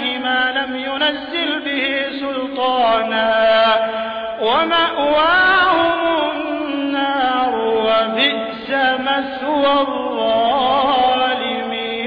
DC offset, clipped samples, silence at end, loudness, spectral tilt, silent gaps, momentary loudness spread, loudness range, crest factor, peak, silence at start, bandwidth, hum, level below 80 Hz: under 0.1%; under 0.1%; 0 s; -16 LUFS; -5.5 dB/octave; none; 8 LU; 3 LU; 12 dB; -4 dBFS; 0 s; 5.2 kHz; none; -52 dBFS